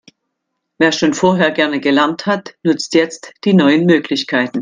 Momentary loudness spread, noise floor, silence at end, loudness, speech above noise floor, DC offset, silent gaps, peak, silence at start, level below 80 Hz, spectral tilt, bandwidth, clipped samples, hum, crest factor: 7 LU; -74 dBFS; 0 s; -14 LUFS; 60 dB; under 0.1%; none; 0 dBFS; 0.8 s; -58 dBFS; -5 dB/octave; 9.6 kHz; under 0.1%; none; 14 dB